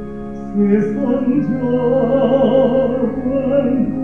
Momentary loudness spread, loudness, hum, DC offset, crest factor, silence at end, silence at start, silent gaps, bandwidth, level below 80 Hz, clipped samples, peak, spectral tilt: 6 LU; -16 LUFS; none; 1%; 14 dB; 0 s; 0 s; none; 6 kHz; -42 dBFS; under 0.1%; -2 dBFS; -9.5 dB/octave